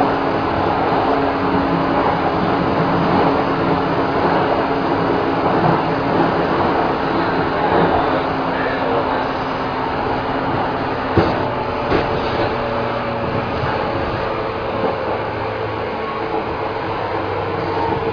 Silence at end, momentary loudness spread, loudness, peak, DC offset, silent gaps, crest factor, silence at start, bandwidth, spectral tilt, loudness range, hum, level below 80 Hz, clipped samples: 0 s; 6 LU; -18 LUFS; -2 dBFS; under 0.1%; none; 16 dB; 0 s; 5.4 kHz; -8 dB/octave; 4 LU; none; -38 dBFS; under 0.1%